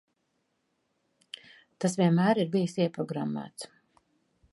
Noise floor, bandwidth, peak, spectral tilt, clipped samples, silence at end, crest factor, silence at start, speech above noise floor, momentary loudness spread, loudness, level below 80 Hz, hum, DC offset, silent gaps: -77 dBFS; 11.5 kHz; -12 dBFS; -6.5 dB/octave; under 0.1%; 0.85 s; 20 dB; 1.8 s; 50 dB; 21 LU; -28 LUFS; -74 dBFS; none; under 0.1%; none